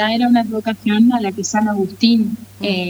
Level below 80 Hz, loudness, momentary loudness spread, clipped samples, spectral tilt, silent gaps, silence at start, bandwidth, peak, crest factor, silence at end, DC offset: -58 dBFS; -16 LUFS; 7 LU; under 0.1%; -4.5 dB/octave; none; 0 s; 16.5 kHz; -2 dBFS; 14 dB; 0 s; under 0.1%